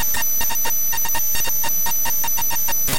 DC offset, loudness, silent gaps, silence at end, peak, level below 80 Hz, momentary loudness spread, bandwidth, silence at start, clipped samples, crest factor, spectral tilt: 10%; -19 LUFS; none; 0 s; -6 dBFS; -40 dBFS; 0 LU; 17.5 kHz; 0 s; under 0.1%; 14 dB; -0.5 dB/octave